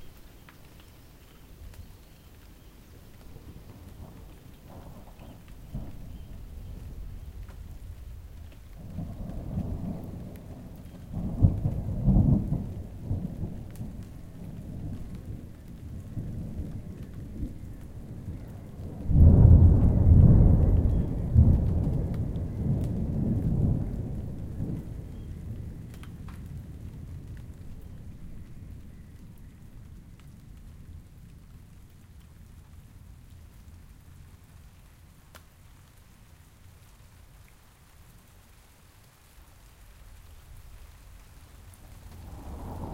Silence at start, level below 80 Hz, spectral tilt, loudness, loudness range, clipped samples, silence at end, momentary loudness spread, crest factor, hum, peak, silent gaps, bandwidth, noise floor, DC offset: 0 s; -34 dBFS; -10 dB/octave; -26 LUFS; 28 LU; under 0.1%; 0 s; 27 LU; 26 dB; none; -4 dBFS; none; 5 kHz; -55 dBFS; under 0.1%